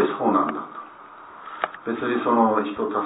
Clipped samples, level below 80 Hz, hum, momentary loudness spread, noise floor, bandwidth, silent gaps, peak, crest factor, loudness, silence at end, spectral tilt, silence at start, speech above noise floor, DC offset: under 0.1%; -68 dBFS; none; 22 LU; -43 dBFS; 4 kHz; none; -6 dBFS; 18 dB; -23 LUFS; 0 s; -10 dB/octave; 0 s; 21 dB; under 0.1%